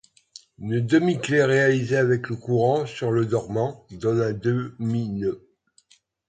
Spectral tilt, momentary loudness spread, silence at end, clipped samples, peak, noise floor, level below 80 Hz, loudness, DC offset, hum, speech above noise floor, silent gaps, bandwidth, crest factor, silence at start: -7 dB/octave; 9 LU; 0.9 s; under 0.1%; -6 dBFS; -60 dBFS; -58 dBFS; -23 LUFS; under 0.1%; none; 38 dB; none; 9.2 kHz; 18 dB; 0.6 s